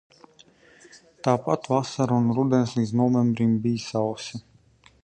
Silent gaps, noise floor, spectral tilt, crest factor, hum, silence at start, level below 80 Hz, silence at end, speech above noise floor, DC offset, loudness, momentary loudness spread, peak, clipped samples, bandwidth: none; -57 dBFS; -7 dB/octave; 18 dB; none; 0.95 s; -62 dBFS; 0.65 s; 34 dB; under 0.1%; -24 LUFS; 8 LU; -6 dBFS; under 0.1%; 9.4 kHz